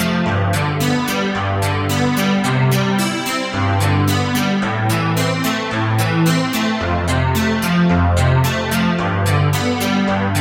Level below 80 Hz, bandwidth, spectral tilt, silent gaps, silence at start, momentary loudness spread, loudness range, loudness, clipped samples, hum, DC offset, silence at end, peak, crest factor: -36 dBFS; 17 kHz; -5.5 dB/octave; none; 0 s; 4 LU; 1 LU; -17 LUFS; under 0.1%; none; under 0.1%; 0 s; -4 dBFS; 14 dB